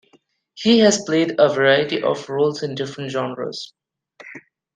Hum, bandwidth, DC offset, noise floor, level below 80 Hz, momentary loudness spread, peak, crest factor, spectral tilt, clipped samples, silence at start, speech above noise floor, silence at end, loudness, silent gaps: none; 9.6 kHz; under 0.1%; -59 dBFS; -66 dBFS; 20 LU; -2 dBFS; 18 dB; -4 dB/octave; under 0.1%; 0.55 s; 41 dB; 0.35 s; -19 LUFS; none